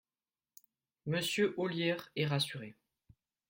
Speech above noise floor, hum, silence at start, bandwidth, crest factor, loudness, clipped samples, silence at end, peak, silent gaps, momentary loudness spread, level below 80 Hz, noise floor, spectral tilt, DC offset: over 55 dB; none; 1.05 s; 16.5 kHz; 18 dB; -34 LUFS; under 0.1%; 0.75 s; -18 dBFS; none; 14 LU; -76 dBFS; under -90 dBFS; -5 dB/octave; under 0.1%